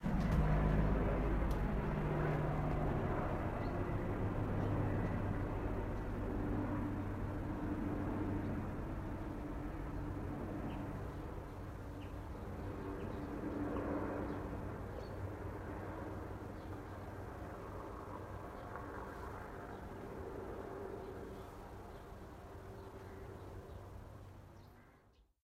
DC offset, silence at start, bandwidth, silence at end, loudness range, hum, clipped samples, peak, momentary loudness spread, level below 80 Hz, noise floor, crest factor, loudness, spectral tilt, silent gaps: under 0.1%; 0 s; 15.5 kHz; 0.45 s; 11 LU; none; under 0.1%; -22 dBFS; 15 LU; -46 dBFS; -68 dBFS; 18 dB; -42 LUFS; -8.5 dB/octave; none